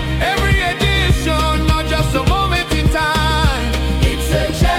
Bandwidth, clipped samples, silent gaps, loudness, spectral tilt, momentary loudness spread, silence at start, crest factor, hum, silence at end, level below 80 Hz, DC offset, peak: 16.5 kHz; under 0.1%; none; -16 LUFS; -5 dB/octave; 2 LU; 0 s; 12 dB; none; 0 s; -20 dBFS; under 0.1%; -4 dBFS